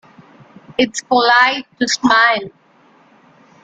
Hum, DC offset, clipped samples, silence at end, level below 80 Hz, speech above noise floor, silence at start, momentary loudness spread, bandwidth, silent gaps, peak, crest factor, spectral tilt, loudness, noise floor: none; under 0.1%; under 0.1%; 1.15 s; -60 dBFS; 36 dB; 0.7 s; 10 LU; 9.2 kHz; none; 0 dBFS; 16 dB; -2 dB/octave; -14 LUFS; -51 dBFS